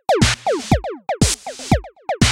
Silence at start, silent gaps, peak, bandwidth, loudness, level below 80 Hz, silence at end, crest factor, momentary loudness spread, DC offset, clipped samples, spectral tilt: 0.1 s; none; -2 dBFS; 16.5 kHz; -19 LUFS; -30 dBFS; 0 s; 16 dB; 9 LU; under 0.1%; under 0.1%; -4 dB/octave